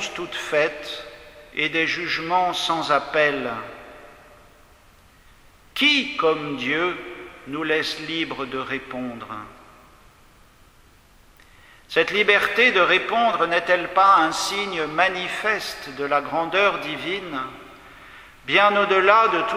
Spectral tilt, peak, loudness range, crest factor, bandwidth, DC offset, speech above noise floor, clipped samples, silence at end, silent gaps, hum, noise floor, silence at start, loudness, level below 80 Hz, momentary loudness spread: -3 dB/octave; 0 dBFS; 10 LU; 22 dB; 16.5 kHz; under 0.1%; 31 dB; under 0.1%; 0 s; none; none; -53 dBFS; 0 s; -20 LUFS; -56 dBFS; 17 LU